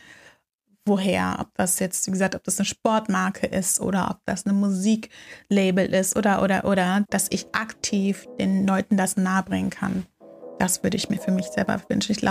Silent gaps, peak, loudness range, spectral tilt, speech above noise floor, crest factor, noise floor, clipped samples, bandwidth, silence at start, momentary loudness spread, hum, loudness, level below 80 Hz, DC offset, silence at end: 0.54-0.59 s; -8 dBFS; 2 LU; -4.5 dB/octave; 44 dB; 16 dB; -67 dBFS; under 0.1%; 15.5 kHz; 0.1 s; 6 LU; none; -23 LUFS; -54 dBFS; under 0.1%; 0 s